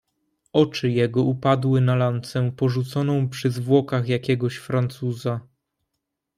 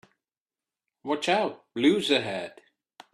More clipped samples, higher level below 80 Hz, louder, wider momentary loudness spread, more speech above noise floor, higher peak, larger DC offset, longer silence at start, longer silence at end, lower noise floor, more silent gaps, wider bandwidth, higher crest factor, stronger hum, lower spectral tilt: neither; first, -62 dBFS vs -72 dBFS; first, -22 LUFS vs -26 LUFS; second, 7 LU vs 14 LU; second, 59 dB vs over 64 dB; first, -4 dBFS vs -8 dBFS; neither; second, 0.55 s vs 1.05 s; first, 0.95 s vs 0.65 s; second, -80 dBFS vs under -90 dBFS; neither; about the same, 12.5 kHz vs 12.5 kHz; about the same, 18 dB vs 20 dB; neither; first, -7.5 dB/octave vs -4.5 dB/octave